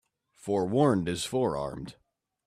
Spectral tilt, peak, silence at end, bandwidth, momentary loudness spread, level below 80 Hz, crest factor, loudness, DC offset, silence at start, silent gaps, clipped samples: -6 dB/octave; -12 dBFS; 0.55 s; 14.5 kHz; 18 LU; -58 dBFS; 18 dB; -28 LUFS; under 0.1%; 0.45 s; none; under 0.1%